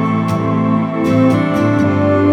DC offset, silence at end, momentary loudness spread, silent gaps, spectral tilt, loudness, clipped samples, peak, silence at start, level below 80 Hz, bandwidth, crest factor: under 0.1%; 0 s; 3 LU; none; -8.5 dB/octave; -14 LUFS; under 0.1%; 0 dBFS; 0 s; -48 dBFS; 13.5 kHz; 12 dB